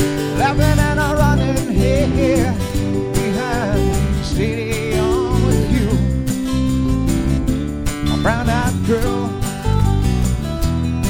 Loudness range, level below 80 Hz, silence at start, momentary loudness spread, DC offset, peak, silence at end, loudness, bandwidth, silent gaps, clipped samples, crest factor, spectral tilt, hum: 2 LU; -24 dBFS; 0 s; 5 LU; under 0.1%; -2 dBFS; 0 s; -18 LUFS; 17 kHz; none; under 0.1%; 14 dB; -6 dB/octave; none